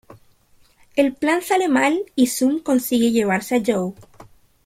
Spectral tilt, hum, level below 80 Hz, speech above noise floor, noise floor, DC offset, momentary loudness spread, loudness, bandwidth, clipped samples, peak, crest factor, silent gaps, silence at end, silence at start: -4.5 dB/octave; none; -58 dBFS; 36 dB; -55 dBFS; under 0.1%; 4 LU; -19 LUFS; 16.5 kHz; under 0.1%; -4 dBFS; 16 dB; none; 0.4 s; 0.1 s